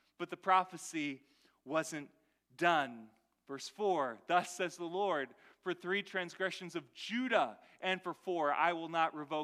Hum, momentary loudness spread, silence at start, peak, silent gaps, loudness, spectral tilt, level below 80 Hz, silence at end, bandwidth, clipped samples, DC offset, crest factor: none; 14 LU; 0.2 s; -14 dBFS; none; -36 LUFS; -3.5 dB/octave; under -90 dBFS; 0 s; 15 kHz; under 0.1%; under 0.1%; 22 dB